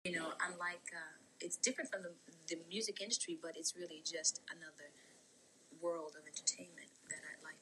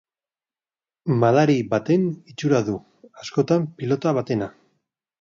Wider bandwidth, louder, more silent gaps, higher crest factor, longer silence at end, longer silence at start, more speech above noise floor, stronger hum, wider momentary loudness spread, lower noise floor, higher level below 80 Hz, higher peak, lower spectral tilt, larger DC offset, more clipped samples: first, 12.5 kHz vs 7.6 kHz; second, -42 LUFS vs -22 LUFS; neither; first, 24 dB vs 18 dB; second, 0 s vs 0.7 s; second, 0.05 s vs 1.05 s; second, 23 dB vs over 69 dB; neither; first, 16 LU vs 12 LU; second, -67 dBFS vs under -90 dBFS; second, under -90 dBFS vs -62 dBFS; second, -20 dBFS vs -4 dBFS; second, -1 dB/octave vs -7.5 dB/octave; neither; neither